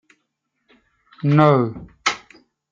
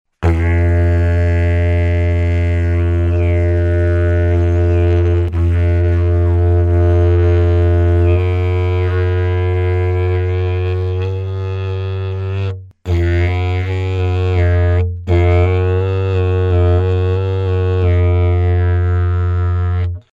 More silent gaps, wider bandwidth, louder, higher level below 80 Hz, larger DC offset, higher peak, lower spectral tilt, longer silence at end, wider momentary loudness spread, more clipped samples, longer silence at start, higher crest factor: neither; first, 7.6 kHz vs 4.6 kHz; second, -19 LUFS vs -15 LUFS; second, -58 dBFS vs -24 dBFS; neither; about the same, -2 dBFS vs -2 dBFS; second, -6.5 dB/octave vs -9.5 dB/octave; first, 0.55 s vs 0.15 s; first, 12 LU vs 6 LU; neither; first, 1.25 s vs 0.2 s; first, 20 dB vs 12 dB